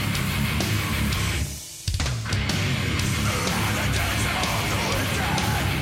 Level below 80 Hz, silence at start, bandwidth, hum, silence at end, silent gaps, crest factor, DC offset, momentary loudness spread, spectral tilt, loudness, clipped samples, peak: -34 dBFS; 0 s; 16.5 kHz; none; 0 s; none; 12 dB; under 0.1%; 3 LU; -4 dB/octave; -24 LUFS; under 0.1%; -12 dBFS